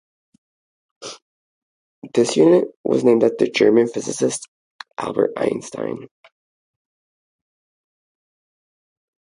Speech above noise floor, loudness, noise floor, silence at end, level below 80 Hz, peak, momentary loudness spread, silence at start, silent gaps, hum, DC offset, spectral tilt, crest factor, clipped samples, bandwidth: over 72 dB; -19 LUFS; under -90 dBFS; 3.3 s; -68 dBFS; -2 dBFS; 20 LU; 1 s; 1.22-2.02 s, 2.76-2.84 s, 4.48-4.79 s; none; under 0.1%; -5 dB/octave; 20 dB; under 0.1%; 11.5 kHz